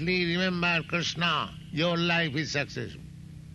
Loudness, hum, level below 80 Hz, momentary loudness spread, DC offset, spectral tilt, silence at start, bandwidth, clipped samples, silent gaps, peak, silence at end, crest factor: -27 LUFS; none; -54 dBFS; 15 LU; under 0.1%; -4.5 dB/octave; 0 s; 10 kHz; under 0.1%; none; -14 dBFS; 0 s; 16 dB